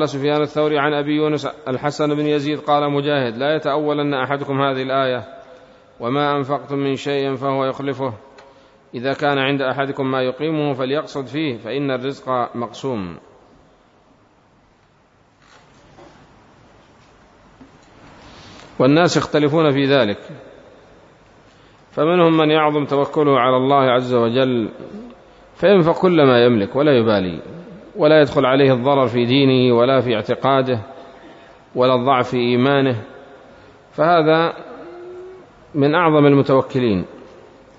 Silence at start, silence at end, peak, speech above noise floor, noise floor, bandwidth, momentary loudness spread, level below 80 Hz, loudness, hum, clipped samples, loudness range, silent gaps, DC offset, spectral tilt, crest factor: 0 s; 0.55 s; -2 dBFS; 38 dB; -55 dBFS; 7.8 kHz; 14 LU; -58 dBFS; -17 LUFS; none; under 0.1%; 7 LU; none; under 0.1%; -6.5 dB/octave; 16 dB